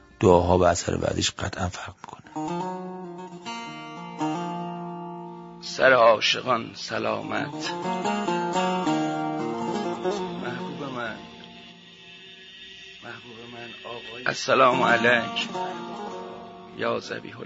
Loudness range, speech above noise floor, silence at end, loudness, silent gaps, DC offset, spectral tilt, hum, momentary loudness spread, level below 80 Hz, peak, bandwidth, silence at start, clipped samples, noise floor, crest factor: 11 LU; 24 dB; 0 s; -25 LUFS; none; under 0.1%; -4.5 dB/octave; none; 22 LU; -54 dBFS; -2 dBFS; 8 kHz; 0.2 s; under 0.1%; -47 dBFS; 24 dB